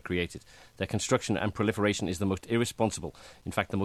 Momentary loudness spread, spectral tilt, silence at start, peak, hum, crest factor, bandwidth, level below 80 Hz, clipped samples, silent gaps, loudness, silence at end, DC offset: 10 LU; -5 dB/octave; 0.05 s; -10 dBFS; none; 22 dB; 14.5 kHz; -54 dBFS; under 0.1%; none; -30 LUFS; 0 s; under 0.1%